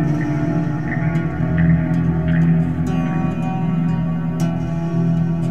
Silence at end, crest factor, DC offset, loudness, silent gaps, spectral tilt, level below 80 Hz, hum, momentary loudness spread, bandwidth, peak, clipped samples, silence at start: 0 s; 12 dB; 2%; -19 LUFS; none; -9 dB/octave; -36 dBFS; none; 5 LU; 7 kHz; -6 dBFS; under 0.1%; 0 s